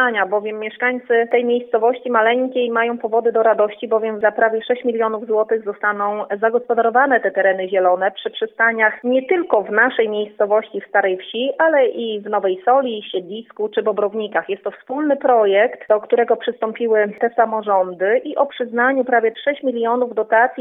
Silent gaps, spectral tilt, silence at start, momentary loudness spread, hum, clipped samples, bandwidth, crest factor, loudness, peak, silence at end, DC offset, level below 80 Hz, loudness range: none; -8 dB/octave; 0 s; 7 LU; none; under 0.1%; 3.9 kHz; 16 dB; -18 LUFS; 0 dBFS; 0 s; under 0.1%; -78 dBFS; 2 LU